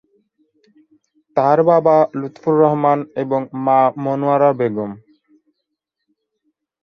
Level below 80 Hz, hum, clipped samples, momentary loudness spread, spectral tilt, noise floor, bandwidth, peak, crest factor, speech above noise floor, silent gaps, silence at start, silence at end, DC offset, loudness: -66 dBFS; none; under 0.1%; 9 LU; -9.5 dB/octave; -77 dBFS; 6.6 kHz; -2 dBFS; 16 dB; 61 dB; none; 1.35 s; 1.85 s; under 0.1%; -16 LUFS